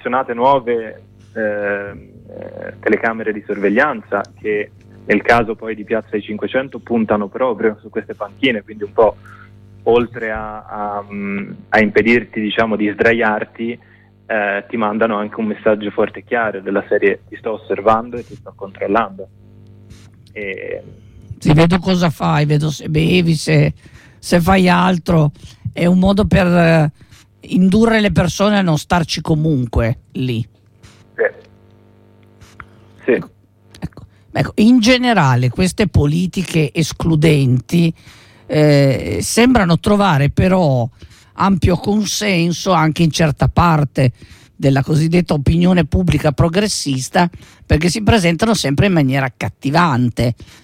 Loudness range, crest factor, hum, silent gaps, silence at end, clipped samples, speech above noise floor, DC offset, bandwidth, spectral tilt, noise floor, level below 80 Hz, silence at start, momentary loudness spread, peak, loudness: 6 LU; 14 dB; none; none; 0.2 s; under 0.1%; 32 dB; under 0.1%; 16 kHz; -6 dB/octave; -47 dBFS; -34 dBFS; 0.05 s; 13 LU; -2 dBFS; -15 LUFS